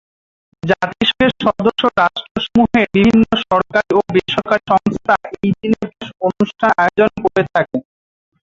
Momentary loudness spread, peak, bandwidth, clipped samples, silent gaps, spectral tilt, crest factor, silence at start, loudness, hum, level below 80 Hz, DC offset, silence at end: 8 LU; 0 dBFS; 7.6 kHz; under 0.1%; 2.31-2.35 s; -6.5 dB/octave; 16 dB; 0.65 s; -15 LUFS; none; -44 dBFS; under 0.1%; 0.65 s